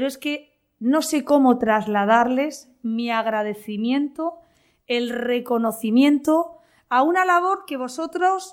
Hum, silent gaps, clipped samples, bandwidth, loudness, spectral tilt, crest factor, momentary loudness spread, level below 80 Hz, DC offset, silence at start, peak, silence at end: none; none; under 0.1%; 17 kHz; -21 LUFS; -4.5 dB/octave; 16 dB; 11 LU; -66 dBFS; under 0.1%; 0 s; -4 dBFS; 0 s